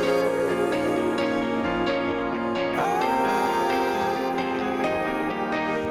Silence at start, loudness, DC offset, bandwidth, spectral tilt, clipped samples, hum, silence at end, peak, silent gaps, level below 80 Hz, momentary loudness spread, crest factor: 0 s; -24 LUFS; under 0.1%; 17 kHz; -5 dB/octave; under 0.1%; none; 0 s; -10 dBFS; none; -52 dBFS; 3 LU; 14 dB